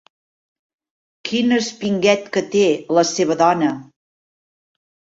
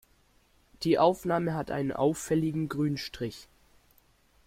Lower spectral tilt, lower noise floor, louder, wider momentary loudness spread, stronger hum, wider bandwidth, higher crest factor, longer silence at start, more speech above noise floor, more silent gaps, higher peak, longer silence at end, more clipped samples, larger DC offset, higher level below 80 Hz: second, -4.5 dB/octave vs -6 dB/octave; first, under -90 dBFS vs -65 dBFS; first, -18 LUFS vs -29 LUFS; second, 7 LU vs 12 LU; neither; second, 8 kHz vs 16.5 kHz; about the same, 18 dB vs 20 dB; first, 1.25 s vs 0.8 s; first, over 73 dB vs 37 dB; neither; first, -2 dBFS vs -10 dBFS; first, 1.3 s vs 1.05 s; neither; neither; about the same, -64 dBFS vs -60 dBFS